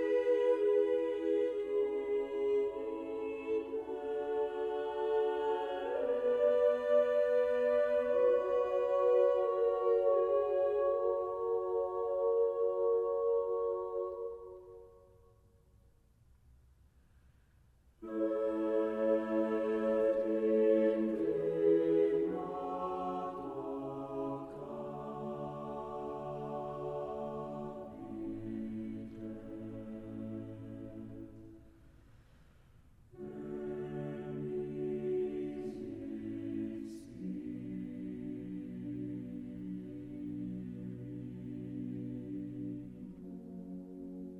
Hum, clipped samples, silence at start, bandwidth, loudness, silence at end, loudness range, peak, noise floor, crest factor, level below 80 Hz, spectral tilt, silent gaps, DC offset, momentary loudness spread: none; under 0.1%; 0 s; 6.8 kHz; -35 LUFS; 0 s; 14 LU; -18 dBFS; -66 dBFS; 16 dB; -66 dBFS; -8.5 dB/octave; none; under 0.1%; 16 LU